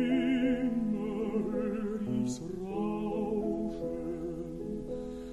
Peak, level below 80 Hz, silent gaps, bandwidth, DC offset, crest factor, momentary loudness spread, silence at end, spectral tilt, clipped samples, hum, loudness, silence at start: -18 dBFS; -52 dBFS; none; 12 kHz; under 0.1%; 14 dB; 10 LU; 0 s; -7 dB/octave; under 0.1%; none; -33 LUFS; 0 s